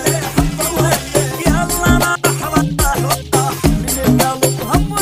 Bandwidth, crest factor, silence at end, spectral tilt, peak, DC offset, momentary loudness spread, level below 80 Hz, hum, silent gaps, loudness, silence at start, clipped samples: 16 kHz; 14 dB; 0 s; -4.5 dB/octave; 0 dBFS; under 0.1%; 3 LU; -24 dBFS; none; none; -15 LUFS; 0 s; under 0.1%